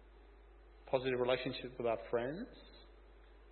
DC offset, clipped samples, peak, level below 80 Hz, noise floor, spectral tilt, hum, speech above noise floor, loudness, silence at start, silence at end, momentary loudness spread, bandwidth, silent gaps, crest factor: under 0.1%; under 0.1%; -20 dBFS; -60 dBFS; -60 dBFS; -3.5 dB/octave; none; 22 dB; -38 LUFS; 0 s; 0 s; 24 LU; 4.3 kHz; none; 22 dB